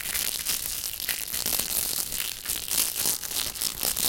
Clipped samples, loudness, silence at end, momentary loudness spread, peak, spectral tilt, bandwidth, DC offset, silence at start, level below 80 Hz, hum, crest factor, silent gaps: under 0.1%; -26 LUFS; 0 s; 5 LU; -8 dBFS; 0.5 dB/octave; 17.5 kHz; under 0.1%; 0 s; -50 dBFS; none; 22 dB; none